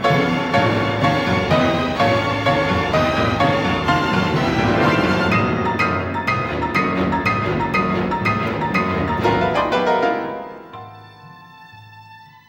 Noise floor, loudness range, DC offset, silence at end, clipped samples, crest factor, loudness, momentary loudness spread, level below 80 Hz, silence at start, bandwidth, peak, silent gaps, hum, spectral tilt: -43 dBFS; 3 LU; under 0.1%; 0.25 s; under 0.1%; 14 dB; -18 LUFS; 4 LU; -40 dBFS; 0 s; 16.5 kHz; -6 dBFS; none; none; -6.5 dB/octave